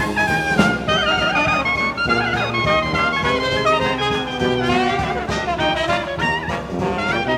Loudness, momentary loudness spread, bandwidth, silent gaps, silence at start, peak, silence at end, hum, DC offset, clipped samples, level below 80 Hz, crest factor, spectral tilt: -18 LUFS; 5 LU; 16 kHz; none; 0 s; -2 dBFS; 0 s; none; under 0.1%; under 0.1%; -38 dBFS; 18 dB; -5 dB/octave